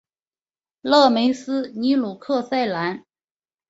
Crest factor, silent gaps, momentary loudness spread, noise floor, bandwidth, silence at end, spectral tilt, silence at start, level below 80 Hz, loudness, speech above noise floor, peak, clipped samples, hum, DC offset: 20 dB; none; 12 LU; under -90 dBFS; 8 kHz; 0.7 s; -5 dB/octave; 0.85 s; -66 dBFS; -20 LUFS; over 70 dB; -2 dBFS; under 0.1%; none; under 0.1%